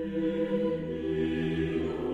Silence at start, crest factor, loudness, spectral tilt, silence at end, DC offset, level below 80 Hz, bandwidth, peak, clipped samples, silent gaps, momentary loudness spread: 0 s; 12 dB; -30 LUFS; -8.5 dB/octave; 0 s; under 0.1%; -50 dBFS; 7.8 kHz; -18 dBFS; under 0.1%; none; 2 LU